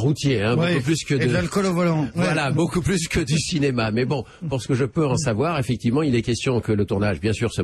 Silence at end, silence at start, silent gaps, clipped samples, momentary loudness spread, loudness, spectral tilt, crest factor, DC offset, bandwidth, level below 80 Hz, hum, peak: 0 s; 0 s; none; under 0.1%; 3 LU; -22 LUFS; -5.5 dB/octave; 12 dB; under 0.1%; 13 kHz; -42 dBFS; none; -10 dBFS